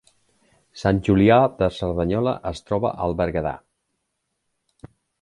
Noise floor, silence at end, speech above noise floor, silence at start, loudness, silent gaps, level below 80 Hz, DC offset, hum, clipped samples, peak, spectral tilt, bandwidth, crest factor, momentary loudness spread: -76 dBFS; 0.35 s; 56 dB; 0.75 s; -21 LUFS; none; -42 dBFS; under 0.1%; none; under 0.1%; -4 dBFS; -8 dB/octave; 11 kHz; 20 dB; 11 LU